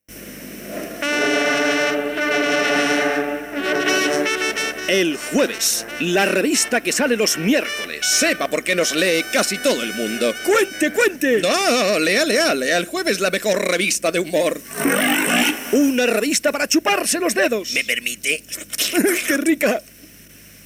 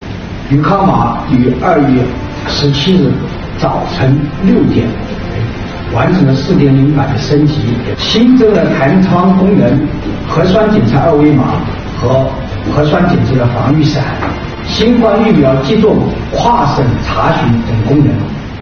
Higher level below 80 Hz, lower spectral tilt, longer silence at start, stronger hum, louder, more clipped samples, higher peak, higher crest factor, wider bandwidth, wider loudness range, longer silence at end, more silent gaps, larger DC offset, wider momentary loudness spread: second, -56 dBFS vs -26 dBFS; second, -2 dB/octave vs -7.5 dB/octave; about the same, 0.1 s vs 0 s; neither; second, -18 LUFS vs -10 LUFS; second, under 0.1% vs 0.2%; second, -6 dBFS vs 0 dBFS; about the same, 14 dB vs 10 dB; first, 17 kHz vs 6.8 kHz; about the same, 2 LU vs 3 LU; first, 0.15 s vs 0 s; neither; neither; second, 6 LU vs 9 LU